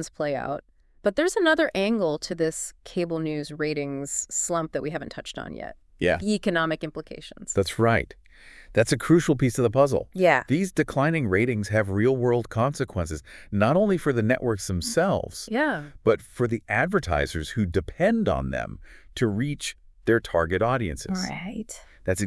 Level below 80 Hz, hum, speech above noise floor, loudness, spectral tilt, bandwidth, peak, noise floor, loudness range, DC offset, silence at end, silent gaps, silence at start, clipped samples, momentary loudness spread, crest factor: -46 dBFS; none; 23 dB; -25 LUFS; -5.5 dB/octave; 12 kHz; -4 dBFS; -48 dBFS; 5 LU; under 0.1%; 0 s; none; 0 s; under 0.1%; 13 LU; 22 dB